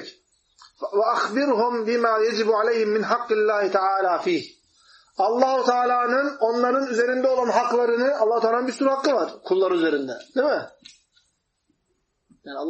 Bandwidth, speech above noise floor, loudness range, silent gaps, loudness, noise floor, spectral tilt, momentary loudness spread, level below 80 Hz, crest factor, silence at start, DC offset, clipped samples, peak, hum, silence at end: 8.4 kHz; 51 dB; 4 LU; none; -22 LUFS; -72 dBFS; -4.5 dB/octave; 7 LU; -76 dBFS; 16 dB; 0 s; under 0.1%; under 0.1%; -6 dBFS; none; 0 s